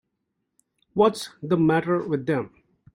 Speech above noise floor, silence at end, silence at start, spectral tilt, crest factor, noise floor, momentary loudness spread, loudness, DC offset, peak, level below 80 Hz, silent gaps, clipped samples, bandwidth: 56 dB; 0.45 s; 0.95 s; -6.5 dB/octave; 18 dB; -78 dBFS; 11 LU; -24 LUFS; under 0.1%; -6 dBFS; -62 dBFS; none; under 0.1%; 16 kHz